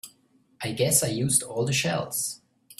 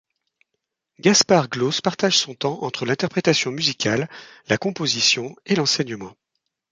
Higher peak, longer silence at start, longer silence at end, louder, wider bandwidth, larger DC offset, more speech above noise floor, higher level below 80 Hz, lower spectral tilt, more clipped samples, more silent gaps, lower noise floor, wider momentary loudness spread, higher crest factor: second, -8 dBFS vs -2 dBFS; second, 0.05 s vs 1.05 s; second, 0.05 s vs 0.6 s; second, -25 LUFS vs -20 LUFS; first, 16 kHz vs 10.5 kHz; neither; second, 38 dB vs 58 dB; about the same, -60 dBFS vs -62 dBFS; about the same, -3 dB/octave vs -3 dB/octave; neither; neither; second, -63 dBFS vs -79 dBFS; first, 12 LU vs 9 LU; about the same, 20 dB vs 20 dB